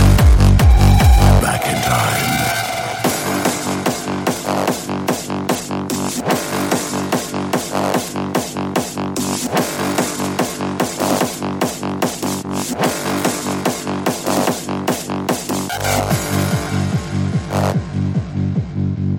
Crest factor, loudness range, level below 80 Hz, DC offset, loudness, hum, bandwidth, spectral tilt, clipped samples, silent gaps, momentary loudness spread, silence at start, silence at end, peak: 16 dB; 5 LU; -22 dBFS; under 0.1%; -18 LUFS; none; 17 kHz; -5 dB/octave; under 0.1%; none; 9 LU; 0 s; 0 s; 0 dBFS